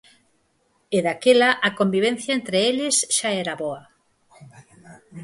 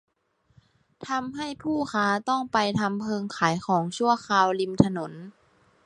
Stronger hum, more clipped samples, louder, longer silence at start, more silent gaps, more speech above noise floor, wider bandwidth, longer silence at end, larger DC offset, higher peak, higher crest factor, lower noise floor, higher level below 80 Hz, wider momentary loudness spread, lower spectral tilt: neither; neither; first, -20 LUFS vs -25 LUFS; about the same, 0.9 s vs 1 s; neither; about the same, 45 dB vs 42 dB; about the same, 11.5 kHz vs 11 kHz; second, 0 s vs 0.55 s; neither; about the same, -4 dBFS vs -2 dBFS; second, 18 dB vs 24 dB; about the same, -66 dBFS vs -67 dBFS; second, -68 dBFS vs -58 dBFS; about the same, 11 LU vs 11 LU; second, -3 dB/octave vs -5.5 dB/octave